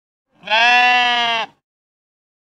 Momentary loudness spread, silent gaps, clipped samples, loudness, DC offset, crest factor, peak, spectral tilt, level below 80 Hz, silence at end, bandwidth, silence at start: 11 LU; none; under 0.1%; -14 LUFS; under 0.1%; 18 dB; 0 dBFS; -0.5 dB/octave; -68 dBFS; 1.05 s; 11.5 kHz; 0.45 s